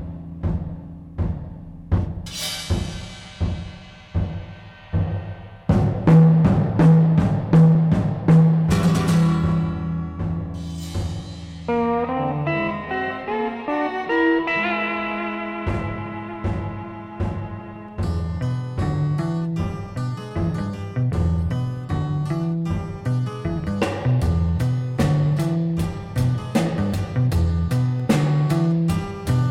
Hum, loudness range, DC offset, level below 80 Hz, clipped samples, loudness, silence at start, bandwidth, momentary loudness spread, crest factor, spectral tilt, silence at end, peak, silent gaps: none; 11 LU; under 0.1%; -36 dBFS; under 0.1%; -22 LUFS; 0 s; 12.5 kHz; 15 LU; 18 dB; -7.5 dB/octave; 0 s; -4 dBFS; none